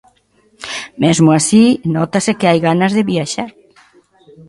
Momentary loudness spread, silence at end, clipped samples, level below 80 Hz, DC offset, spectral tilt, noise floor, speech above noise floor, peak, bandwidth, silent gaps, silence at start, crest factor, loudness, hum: 15 LU; 1 s; under 0.1%; -52 dBFS; under 0.1%; -5 dB/octave; -55 dBFS; 42 dB; 0 dBFS; 11.5 kHz; none; 0.6 s; 14 dB; -13 LUFS; none